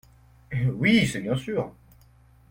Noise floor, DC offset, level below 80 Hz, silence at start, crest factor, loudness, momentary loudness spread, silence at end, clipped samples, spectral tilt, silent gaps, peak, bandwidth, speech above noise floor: -56 dBFS; under 0.1%; -52 dBFS; 0.5 s; 18 dB; -25 LUFS; 12 LU; 0.8 s; under 0.1%; -6 dB/octave; none; -8 dBFS; 16.5 kHz; 32 dB